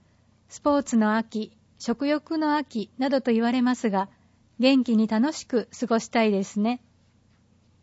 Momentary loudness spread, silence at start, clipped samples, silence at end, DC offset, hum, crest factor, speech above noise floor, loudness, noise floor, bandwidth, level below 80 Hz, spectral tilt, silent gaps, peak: 11 LU; 0.5 s; under 0.1%; 1.05 s; under 0.1%; none; 16 dB; 37 dB; -25 LUFS; -61 dBFS; 8 kHz; -66 dBFS; -5 dB/octave; none; -10 dBFS